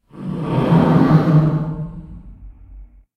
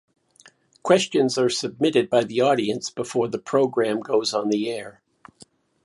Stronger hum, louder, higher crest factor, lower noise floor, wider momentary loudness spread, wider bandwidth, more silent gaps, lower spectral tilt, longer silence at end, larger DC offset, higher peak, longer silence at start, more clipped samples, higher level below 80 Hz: neither; first, -15 LUFS vs -22 LUFS; about the same, 18 dB vs 20 dB; second, -40 dBFS vs -55 dBFS; first, 16 LU vs 8 LU; second, 5.6 kHz vs 11.5 kHz; neither; first, -10 dB/octave vs -4.5 dB/octave; second, 0.3 s vs 0.95 s; neither; first, 0 dBFS vs -4 dBFS; second, 0.15 s vs 0.85 s; neither; first, -40 dBFS vs -68 dBFS